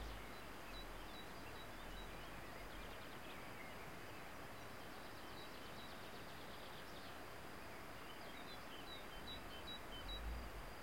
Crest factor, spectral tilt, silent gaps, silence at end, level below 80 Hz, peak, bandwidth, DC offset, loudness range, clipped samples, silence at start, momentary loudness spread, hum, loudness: 16 dB; -4 dB/octave; none; 0 s; -60 dBFS; -38 dBFS; 16.5 kHz; 0.1%; 2 LU; under 0.1%; 0 s; 3 LU; none; -53 LUFS